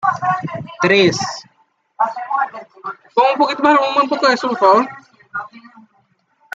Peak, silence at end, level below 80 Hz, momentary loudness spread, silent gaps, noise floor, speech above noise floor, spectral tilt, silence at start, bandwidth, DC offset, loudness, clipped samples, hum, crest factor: -2 dBFS; 0.95 s; -64 dBFS; 17 LU; none; -60 dBFS; 46 dB; -4.5 dB/octave; 0 s; 8 kHz; under 0.1%; -16 LUFS; under 0.1%; none; 16 dB